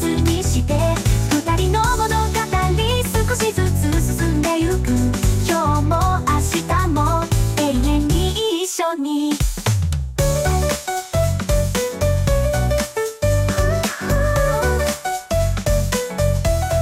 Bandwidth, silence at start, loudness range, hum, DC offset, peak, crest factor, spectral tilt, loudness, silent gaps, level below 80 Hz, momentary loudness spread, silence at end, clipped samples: 16 kHz; 0 s; 2 LU; none; under 0.1%; -6 dBFS; 12 dB; -5 dB/octave; -19 LUFS; none; -24 dBFS; 3 LU; 0 s; under 0.1%